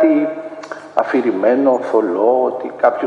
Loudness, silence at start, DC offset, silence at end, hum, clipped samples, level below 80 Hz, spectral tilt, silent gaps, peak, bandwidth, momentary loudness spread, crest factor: -16 LUFS; 0 s; under 0.1%; 0 s; none; under 0.1%; -66 dBFS; -7 dB/octave; none; 0 dBFS; 8.4 kHz; 11 LU; 16 dB